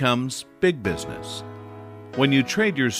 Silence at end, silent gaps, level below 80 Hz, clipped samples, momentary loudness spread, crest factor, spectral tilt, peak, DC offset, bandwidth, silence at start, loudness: 0 s; none; -52 dBFS; under 0.1%; 20 LU; 18 dB; -5 dB/octave; -6 dBFS; under 0.1%; 15.5 kHz; 0 s; -23 LUFS